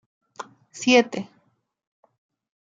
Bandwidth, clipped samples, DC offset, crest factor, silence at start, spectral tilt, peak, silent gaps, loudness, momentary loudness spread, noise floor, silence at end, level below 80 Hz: 9 kHz; under 0.1%; under 0.1%; 24 dB; 0.4 s; -3 dB/octave; -2 dBFS; none; -21 LUFS; 23 LU; -43 dBFS; 1.4 s; -78 dBFS